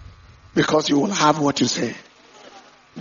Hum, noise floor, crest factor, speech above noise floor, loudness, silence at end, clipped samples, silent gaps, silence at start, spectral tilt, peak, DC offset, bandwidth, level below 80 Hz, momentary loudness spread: none; -47 dBFS; 20 dB; 28 dB; -20 LUFS; 0 s; under 0.1%; none; 0 s; -3.5 dB/octave; -2 dBFS; under 0.1%; 7.4 kHz; -54 dBFS; 9 LU